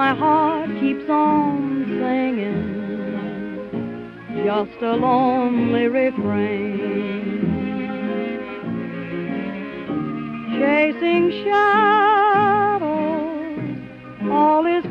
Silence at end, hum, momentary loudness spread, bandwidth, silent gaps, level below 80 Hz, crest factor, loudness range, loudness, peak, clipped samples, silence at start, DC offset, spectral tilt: 0 s; none; 13 LU; 6.2 kHz; none; -56 dBFS; 16 dB; 8 LU; -20 LUFS; -4 dBFS; under 0.1%; 0 s; under 0.1%; -8.5 dB/octave